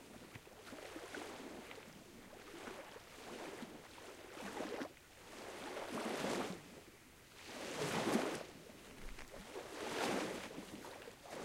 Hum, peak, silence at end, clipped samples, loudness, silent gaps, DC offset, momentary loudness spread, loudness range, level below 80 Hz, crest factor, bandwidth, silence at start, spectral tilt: none; -22 dBFS; 0 s; under 0.1%; -46 LUFS; none; under 0.1%; 16 LU; 9 LU; -66 dBFS; 24 dB; 16 kHz; 0 s; -3.5 dB/octave